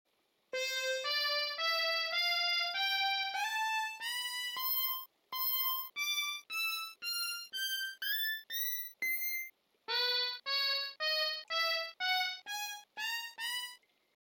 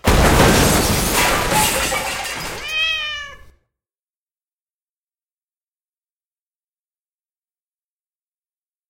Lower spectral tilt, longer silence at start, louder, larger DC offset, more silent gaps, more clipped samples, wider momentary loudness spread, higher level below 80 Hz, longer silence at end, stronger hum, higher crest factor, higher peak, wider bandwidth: second, 3.5 dB/octave vs -3.5 dB/octave; first, 0.55 s vs 0.05 s; second, -34 LUFS vs -16 LUFS; neither; neither; neither; second, 7 LU vs 13 LU; second, under -90 dBFS vs -30 dBFS; second, 0.45 s vs 5.55 s; neither; second, 14 dB vs 20 dB; second, -22 dBFS vs 0 dBFS; first, over 20 kHz vs 16.5 kHz